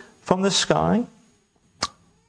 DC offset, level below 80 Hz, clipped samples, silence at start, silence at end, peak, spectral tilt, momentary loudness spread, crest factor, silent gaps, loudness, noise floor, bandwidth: under 0.1%; -52 dBFS; under 0.1%; 0.25 s; 0.4 s; 0 dBFS; -4 dB/octave; 11 LU; 24 dB; none; -22 LUFS; -62 dBFS; 10.5 kHz